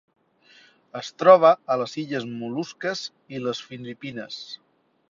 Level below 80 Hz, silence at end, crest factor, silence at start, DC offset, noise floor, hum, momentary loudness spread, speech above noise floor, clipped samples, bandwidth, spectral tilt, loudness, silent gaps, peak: -72 dBFS; 0.55 s; 22 dB; 0.95 s; under 0.1%; -56 dBFS; none; 21 LU; 33 dB; under 0.1%; 7.6 kHz; -5 dB/octave; -22 LUFS; none; -2 dBFS